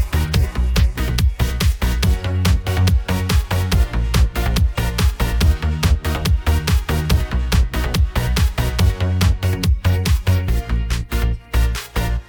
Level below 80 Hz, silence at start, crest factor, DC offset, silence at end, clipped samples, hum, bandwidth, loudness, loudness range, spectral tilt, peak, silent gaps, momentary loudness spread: -20 dBFS; 0 s; 14 dB; under 0.1%; 0.05 s; under 0.1%; none; 20 kHz; -19 LUFS; 0 LU; -5.5 dB/octave; -4 dBFS; none; 3 LU